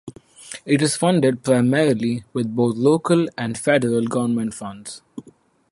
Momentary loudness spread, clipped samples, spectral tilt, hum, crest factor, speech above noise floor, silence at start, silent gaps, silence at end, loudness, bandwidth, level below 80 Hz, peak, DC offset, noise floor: 17 LU; under 0.1%; -5.5 dB/octave; none; 18 dB; 33 dB; 0.05 s; none; 0.5 s; -19 LUFS; 11.5 kHz; -60 dBFS; -4 dBFS; under 0.1%; -53 dBFS